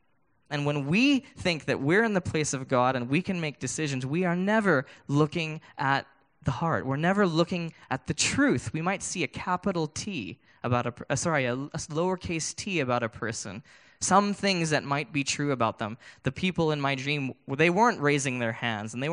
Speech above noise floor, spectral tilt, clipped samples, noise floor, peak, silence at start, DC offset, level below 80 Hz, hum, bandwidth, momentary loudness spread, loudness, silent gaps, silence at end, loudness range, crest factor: 43 dB; -4.5 dB/octave; under 0.1%; -71 dBFS; -8 dBFS; 0.5 s; under 0.1%; -60 dBFS; none; 10.5 kHz; 10 LU; -27 LUFS; none; 0 s; 3 LU; 20 dB